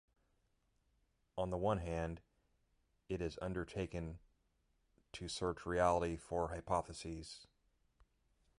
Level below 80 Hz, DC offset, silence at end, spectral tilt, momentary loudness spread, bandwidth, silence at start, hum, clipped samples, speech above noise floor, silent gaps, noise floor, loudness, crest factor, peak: -56 dBFS; under 0.1%; 1.15 s; -5.5 dB/octave; 15 LU; 11 kHz; 1.35 s; none; under 0.1%; 39 dB; none; -79 dBFS; -41 LUFS; 24 dB; -20 dBFS